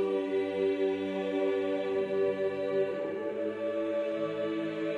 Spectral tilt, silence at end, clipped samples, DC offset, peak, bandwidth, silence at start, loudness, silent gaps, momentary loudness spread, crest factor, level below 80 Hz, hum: -7 dB/octave; 0 s; under 0.1%; under 0.1%; -18 dBFS; 9 kHz; 0 s; -32 LUFS; none; 4 LU; 12 dB; -78 dBFS; none